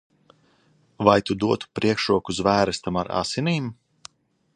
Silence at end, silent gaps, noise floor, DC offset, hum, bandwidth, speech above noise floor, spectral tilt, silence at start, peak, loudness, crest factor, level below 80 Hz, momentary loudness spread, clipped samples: 0.85 s; none; -61 dBFS; under 0.1%; none; 10.5 kHz; 39 dB; -5.5 dB/octave; 1 s; -2 dBFS; -23 LUFS; 22 dB; -52 dBFS; 7 LU; under 0.1%